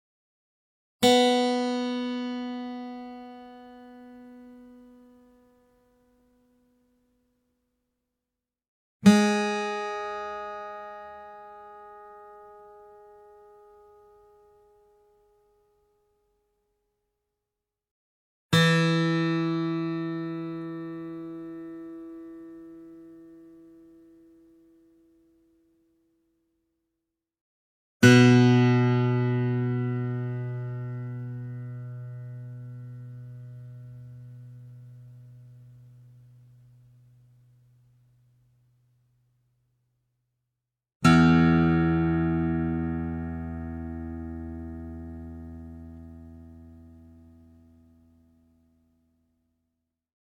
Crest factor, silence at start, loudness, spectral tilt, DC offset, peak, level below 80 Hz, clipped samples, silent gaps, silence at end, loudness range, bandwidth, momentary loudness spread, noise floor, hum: 24 dB; 1 s; -25 LUFS; -6 dB/octave; under 0.1%; -4 dBFS; -52 dBFS; under 0.1%; 8.68-9.00 s, 17.91-18.49 s, 27.41-28.00 s, 40.95-41.00 s; 3.5 s; 24 LU; 16 kHz; 27 LU; -88 dBFS; none